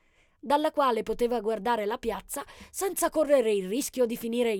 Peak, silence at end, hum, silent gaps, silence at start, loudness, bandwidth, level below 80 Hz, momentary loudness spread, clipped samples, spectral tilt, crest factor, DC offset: -10 dBFS; 0 s; none; none; 0.45 s; -28 LUFS; 19 kHz; -54 dBFS; 11 LU; under 0.1%; -3.5 dB/octave; 18 dB; under 0.1%